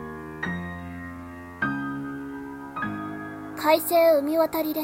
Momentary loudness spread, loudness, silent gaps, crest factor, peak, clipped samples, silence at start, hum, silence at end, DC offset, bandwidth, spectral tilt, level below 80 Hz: 18 LU; -26 LUFS; none; 18 dB; -8 dBFS; under 0.1%; 0 s; none; 0 s; under 0.1%; 16.5 kHz; -5 dB/octave; -56 dBFS